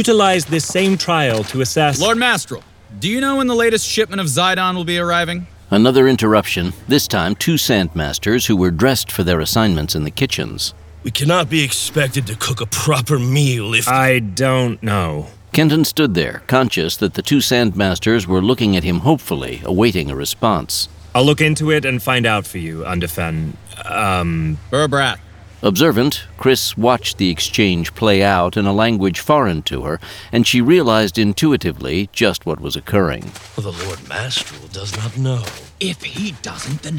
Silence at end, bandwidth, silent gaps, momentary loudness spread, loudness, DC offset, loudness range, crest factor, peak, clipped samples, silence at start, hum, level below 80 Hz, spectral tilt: 0 s; over 20 kHz; none; 10 LU; -16 LUFS; under 0.1%; 4 LU; 16 dB; 0 dBFS; under 0.1%; 0 s; none; -40 dBFS; -4.5 dB/octave